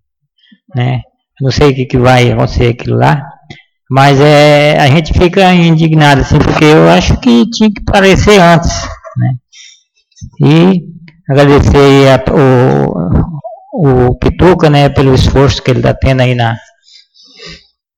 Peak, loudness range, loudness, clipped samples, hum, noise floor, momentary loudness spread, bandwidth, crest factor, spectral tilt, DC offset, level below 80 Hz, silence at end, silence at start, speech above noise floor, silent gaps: 0 dBFS; 4 LU; -7 LUFS; 0.5%; none; -53 dBFS; 11 LU; 13 kHz; 8 dB; -6.5 dB/octave; under 0.1%; -24 dBFS; 0.4 s; 0.75 s; 47 dB; none